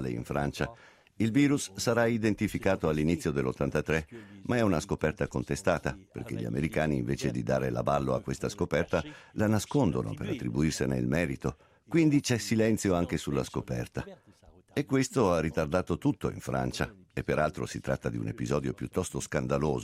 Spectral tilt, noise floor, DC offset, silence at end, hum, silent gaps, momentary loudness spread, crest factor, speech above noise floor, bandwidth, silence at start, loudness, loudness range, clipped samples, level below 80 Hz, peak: -6 dB/octave; -58 dBFS; under 0.1%; 0 s; none; none; 9 LU; 20 dB; 29 dB; 15.5 kHz; 0 s; -30 LUFS; 3 LU; under 0.1%; -50 dBFS; -10 dBFS